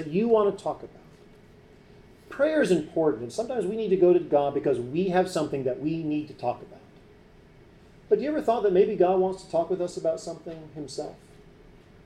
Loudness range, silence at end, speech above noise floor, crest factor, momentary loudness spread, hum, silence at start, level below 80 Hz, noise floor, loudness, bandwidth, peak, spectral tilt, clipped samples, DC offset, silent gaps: 5 LU; 0.9 s; 28 dB; 16 dB; 16 LU; none; 0 s; -58 dBFS; -53 dBFS; -26 LUFS; 11.5 kHz; -10 dBFS; -6.5 dB/octave; under 0.1%; under 0.1%; none